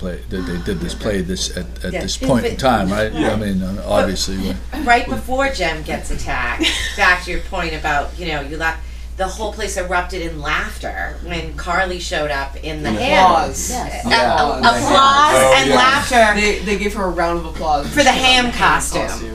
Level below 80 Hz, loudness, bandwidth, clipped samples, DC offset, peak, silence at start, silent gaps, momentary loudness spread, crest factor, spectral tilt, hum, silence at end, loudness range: -28 dBFS; -17 LUFS; 15.5 kHz; under 0.1%; under 0.1%; 0 dBFS; 0 s; none; 13 LU; 16 dB; -3.5 dB/octave; none; 0 s; 9 LU